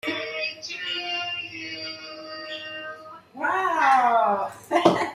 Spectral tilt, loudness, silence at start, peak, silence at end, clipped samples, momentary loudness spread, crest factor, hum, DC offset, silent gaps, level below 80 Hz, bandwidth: -4 dB/octave; -25 LUFS; 0.05 s; -2 dBFS; 0 s; under 0.1%; 17 LU; 24 dB; none; under 0.1%; none; -70 dBFS; 14 kHz